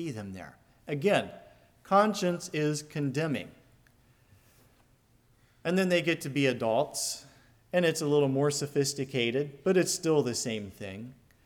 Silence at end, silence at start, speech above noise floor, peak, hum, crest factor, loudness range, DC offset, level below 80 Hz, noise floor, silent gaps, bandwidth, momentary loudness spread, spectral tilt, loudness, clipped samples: 0.35 s; 0 s; 36 dB; -12 dBFS; none; 20 dB; 6 LU; under 0.1%; -68 dBFS; -65 dBFS; none; 19 kHz; 15 LU; -4.5 dB/octave; -29 LUFS; under 0.1%